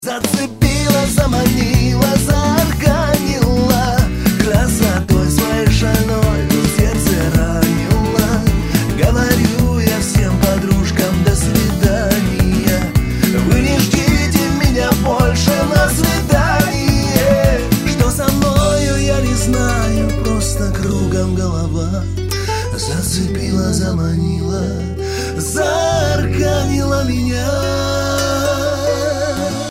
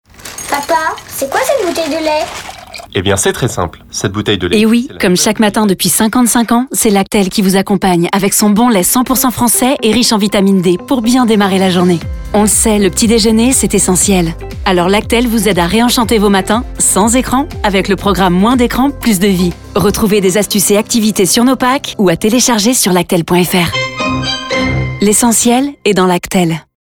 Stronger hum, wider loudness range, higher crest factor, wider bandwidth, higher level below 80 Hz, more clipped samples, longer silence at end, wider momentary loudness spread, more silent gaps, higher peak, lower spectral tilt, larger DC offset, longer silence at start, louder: neither; about the same, 4 LU vs 3 LU; about the same, 14 dB vs 10 dB; second, 16.5 kHz vs 19 kHz; first, -22 dBFS vs -30 dBFS; neither; second, 0 s vs 0.2 s; about the same, 5 LU vs 7 LU; neither; about the same, 0 dBFS vs 0 dBFS; first, -5.5 dB/octave vs -4 dB/octave; neither; second, 0 s vs 0.2 s; second, -15 LUFS vs -11 LUFS